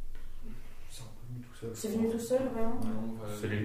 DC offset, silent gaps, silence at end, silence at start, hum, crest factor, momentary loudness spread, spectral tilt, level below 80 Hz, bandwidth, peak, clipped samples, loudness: under 0.1%; none; 0 s; 0 s; none; 14 dB; 19 LU; -6 dB/octave; -44 dBFS; 15.5 kHz; -18 dBFS; under 0.1%; -35 LUFS